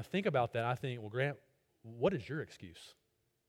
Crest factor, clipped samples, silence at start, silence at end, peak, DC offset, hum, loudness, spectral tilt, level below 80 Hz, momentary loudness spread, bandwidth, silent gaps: 20 dB; under 0.1%; 0 s; 0.55 s; -20 dBFS; under 0.1%; none; -37 LUFS; -7 dB/octave; -70 dBFS; 20 LU; 16 kHz; none